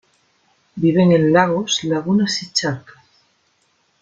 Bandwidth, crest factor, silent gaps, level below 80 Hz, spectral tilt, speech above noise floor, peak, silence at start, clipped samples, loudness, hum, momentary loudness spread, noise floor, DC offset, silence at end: 7.8 kHz; 18 dB; none; -58 dBFS; -5 dB/octave; 46 dB; -2 dBFS; 0.75 s; under 0.1%; -17 LUFS; none; 10 LU; -63 dBFS; under 0.1%; 1.2 s